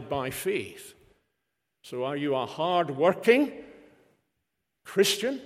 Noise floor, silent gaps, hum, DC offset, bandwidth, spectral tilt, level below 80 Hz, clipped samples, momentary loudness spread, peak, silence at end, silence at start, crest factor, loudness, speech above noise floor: -82 dBFS; none; none; under 0.1%; 16 kHz; -4 dB/octave; -68 dBFS; under 0.1%; 16 LU; -8 dBFS; 0 s; 0 s; 22 dB; -26 LUFS; 55 dB